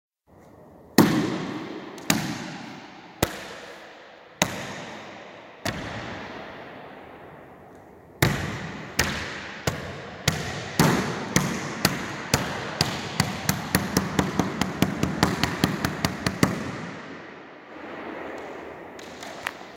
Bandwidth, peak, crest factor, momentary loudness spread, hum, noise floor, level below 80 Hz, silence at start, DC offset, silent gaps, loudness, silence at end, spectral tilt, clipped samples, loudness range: 17 kHz; 0 dBFS; 28 dB; 18 LU; none; -53 dBFS; -48 dBFS; 0.35 s; under 0.1%; none; -27 LUFS; 0 s; -4 dB/octave; under 0.1%; 8 LU